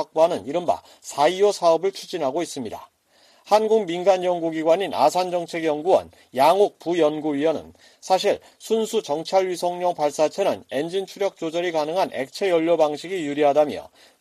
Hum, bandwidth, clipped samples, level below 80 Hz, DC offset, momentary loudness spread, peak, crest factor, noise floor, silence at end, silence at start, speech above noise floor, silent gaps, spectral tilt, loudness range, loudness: none; 15 kHz; under 0.1%; -68 dBFS; under 0.1%; 9 LU; -6 dBFS; 16 dB; -57 dBFS; 0.35 s; 0 s; 36 dB; none; -4.5 dB/octave; 3 LU; -22 LUFS